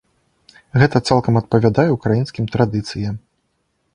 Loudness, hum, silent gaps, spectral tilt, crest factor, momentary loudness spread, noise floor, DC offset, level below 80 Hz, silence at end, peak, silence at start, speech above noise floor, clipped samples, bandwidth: -17 LUFS; none; none; -7 dB/octave; 18 dB; 10 LU; -68 dBFS; under 0.1%; -44 dBFS; 0.75 s; 0 dBFS; 0.75 s; 52 dB; under 0.1%; 10 kHz